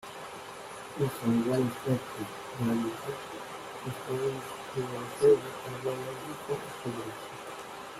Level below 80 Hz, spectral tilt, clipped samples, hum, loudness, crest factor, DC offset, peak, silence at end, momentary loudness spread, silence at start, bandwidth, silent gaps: -66 dBFS; -6 dB/octave; under 0.1%; none; -33 LUFS; 20 dB; under 0.1%; -12 dBFS; 0 s; 14 LU; 0 s; 15.5 kHz; none